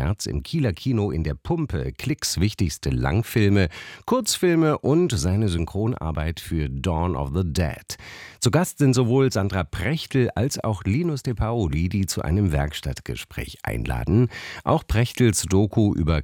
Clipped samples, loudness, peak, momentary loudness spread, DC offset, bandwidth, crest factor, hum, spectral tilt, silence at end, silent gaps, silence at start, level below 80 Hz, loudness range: under 0.1%; -23 LUFS; -6 dBFS; 8 LU; under 0.1%; 18 kHz; 16 dB; none; -5.5 dB/octave; 0 s; none; 0 s; -36 dBFS; 3 LU